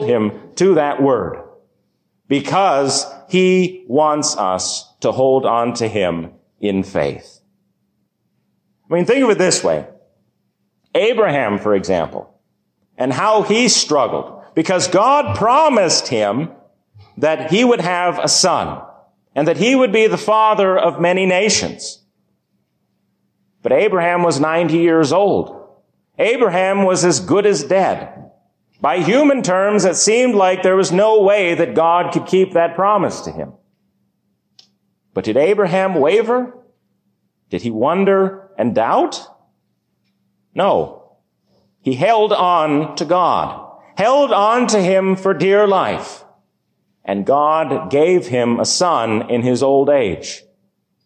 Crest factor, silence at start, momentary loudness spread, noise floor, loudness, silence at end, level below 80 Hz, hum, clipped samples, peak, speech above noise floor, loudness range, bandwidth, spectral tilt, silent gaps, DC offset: 14 dB; 0 s; 11 LU; -67 dBFS; -15 LUFS; 0.65 s; -54 dBFS; none; under 0.1%; -2 dBFS; 52 dB; 5 LU; 10 kHz; -4 dB/octave; none; under 0.1%